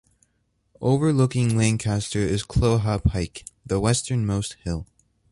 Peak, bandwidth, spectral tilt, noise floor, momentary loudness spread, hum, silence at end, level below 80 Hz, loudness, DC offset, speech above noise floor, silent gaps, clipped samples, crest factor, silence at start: -6 dBFS; 11.5 kHz; -6 dB/octave; -70 dBFS; 10 LU; none; 0.5 s; -38 dBFS; -23 LUFS; under 0.1%; 48 dB; none; under 0.1%; 18 dB; 0.8 s